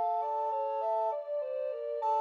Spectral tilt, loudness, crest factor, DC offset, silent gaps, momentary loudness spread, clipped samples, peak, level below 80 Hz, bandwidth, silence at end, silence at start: -1 dB/octave; -33 LUFS; 10 dB; under 0.1%; none; 4 LU; under 0.1%; -22 dBFS; under -90 dBFS; 6.6 kHz; 0 s; 0 s